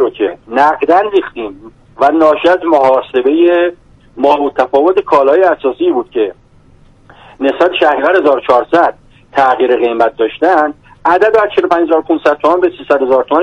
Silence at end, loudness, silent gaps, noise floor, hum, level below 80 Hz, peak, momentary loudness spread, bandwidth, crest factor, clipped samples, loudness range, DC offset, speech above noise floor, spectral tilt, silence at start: 0 s; -11 LUFS; none; -43 dBFS; none; -48 dBFS; 0 dBFS; 7 LU; 8.2 kHz; 12 dB; under 0.1%; 2 LU; under 0.1%; 33 dB; -5.5 dB/octave; 0 s